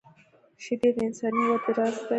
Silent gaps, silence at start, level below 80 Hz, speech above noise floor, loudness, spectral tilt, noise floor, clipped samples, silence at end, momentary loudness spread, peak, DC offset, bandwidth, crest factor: none; 0.6 s; -66 dBFS; 33 dB; -26 LUFS; -5.5 dB/octave; -59 dBFS; under 0.1%; 0 s; 7 LU; -12 dBFS; under 0.1%; 8.8 kHz; 16 dB